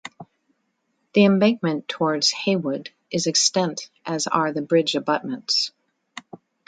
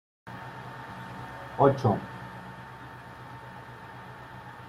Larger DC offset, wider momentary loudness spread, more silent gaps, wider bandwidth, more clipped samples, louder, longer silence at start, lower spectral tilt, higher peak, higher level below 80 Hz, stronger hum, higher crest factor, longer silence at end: neither; second, 15 LU vs 20 LU; neither; second, 9.4 kHz vs 15 kHz; neither; first, -21 LUFS vs -30 LUFS; second, 0.05 s vs 0.25 s; second, -3.5 dB/octave vs -8 dB/octave; about the same, -4 dBFS vs -6 dBFS; second, -70 dBFS vs -60 dBFS; second, none vs 60 Hz at -50 dBFS; second, 20 dB vs 26 dB; first, 0.3 s vs 0 s